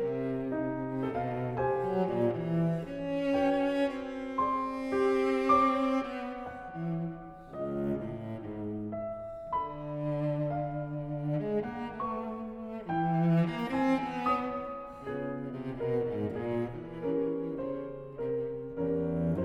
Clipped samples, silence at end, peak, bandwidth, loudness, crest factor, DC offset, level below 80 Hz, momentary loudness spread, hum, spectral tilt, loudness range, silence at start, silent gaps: under 0.1%; 0 s; -14 dBFS; 10 kHz; -33 LUFS; 18 dB; under 0.1%; -58 dBFS; 11 LU; none; -8.5 dB/octave; 6 LU; 0 s; none